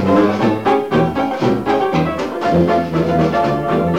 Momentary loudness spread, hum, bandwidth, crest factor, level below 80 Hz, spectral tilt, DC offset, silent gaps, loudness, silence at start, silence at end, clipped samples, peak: 4 LU; none; 15.5 kHz; 12 dB; -40 dBFS; -7.5 dB/octave; 0.5%; none; -16 LUFS; 0 s; 0 s; under 0.1%; -2 dBFS